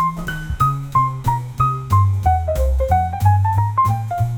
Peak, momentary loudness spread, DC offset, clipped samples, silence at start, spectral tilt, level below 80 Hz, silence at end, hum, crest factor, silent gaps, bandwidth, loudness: -2 dBFS; 5 LU; 0.2%; under 0.1%; 0 s; -7.5 dB/octave; -26 dBFS; 0 s; none; 14 dB; none; 18 kHz; -18 LUFS